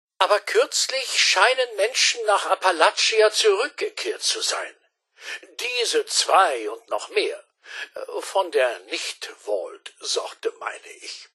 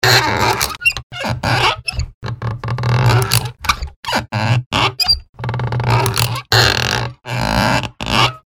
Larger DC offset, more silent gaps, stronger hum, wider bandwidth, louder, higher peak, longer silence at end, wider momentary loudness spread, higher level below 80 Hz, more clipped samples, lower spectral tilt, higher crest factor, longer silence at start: neither; second, none vs 1.03-1.10 s, 2.14-2.21 s, 3.96-4.03 s, 4.66-4.71 s, 5.29-5.33 s; neither; second, 12.5 kHz vs over 20 kHz; second, -21 LUFS vs -16 LUFS; about the same, -2 dBFS vs 0 dBFS; about the same, 0.1 s vs 0.15 s; first, 17 LU vs 11 LU; second, -88 dBFS vs -32 dBFS; neither; second, 3 dB/octave vs -3.5 dB/octave; about the same, 20 dB vs 16 dB; first, 0.2 s vs 0 s